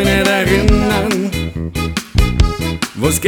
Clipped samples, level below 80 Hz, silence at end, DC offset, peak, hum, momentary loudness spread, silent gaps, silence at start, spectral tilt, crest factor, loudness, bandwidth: under 0.1%; -20 dBFS; 0 s; under 0.1%; 0 dBFS; none; 8 LU; none; 0 s; -5 dB/octave; 14 dB; -15 LUFS; 19.5 kHz